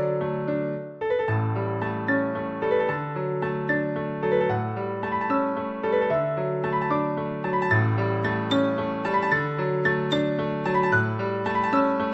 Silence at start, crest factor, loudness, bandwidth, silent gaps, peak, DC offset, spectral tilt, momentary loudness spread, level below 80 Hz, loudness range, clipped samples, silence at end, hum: 0 s; 16 dB; -25 LUFS; 7.8 kHz; none; -10 dBFS; under 0.1%; -8 dB/octave; 6 LU; -58 dBFS; 2 LU; under 0.1%; 0 s; none